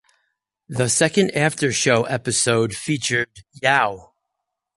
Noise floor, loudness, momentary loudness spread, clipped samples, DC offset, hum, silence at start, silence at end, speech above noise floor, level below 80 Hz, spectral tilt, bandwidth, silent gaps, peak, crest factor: -80 dBFS; -19 LUFS; 7 LU; under 0.1%; under 0.1%; none; 0.7 s; 0.75 s; 60 dB; -56 dBFS; -3.5 dB/octave; 11.5 kHz; none; -2 dBFS; 20 dB